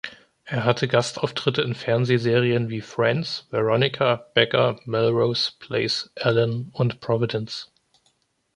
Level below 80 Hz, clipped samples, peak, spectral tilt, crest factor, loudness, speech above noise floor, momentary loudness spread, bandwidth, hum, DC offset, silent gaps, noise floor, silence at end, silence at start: -60 dBFS; under 0.1%; -2 dBFS; -5.5 dB/octave; 20 dB; -23 LUFS; 45 dB; 6 LU; 10.5 kHz; none; under 0.1%; none; -67 dBFS; 0.9 s; 0.05 s